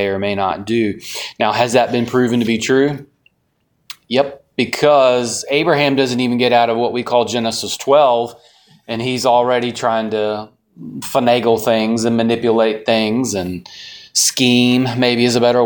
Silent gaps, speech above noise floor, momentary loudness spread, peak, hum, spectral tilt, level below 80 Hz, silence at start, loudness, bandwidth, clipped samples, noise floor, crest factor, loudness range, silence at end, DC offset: none; 49 dB; 10 LU; 0 dBFS; none; -4 dB/octave; -56 dBFS; 0 s; -15 LUFS; 19.5 kHz; under 0.1%; -65 dBFS; 16 dB; 3 LU; 0 s; under 0.1%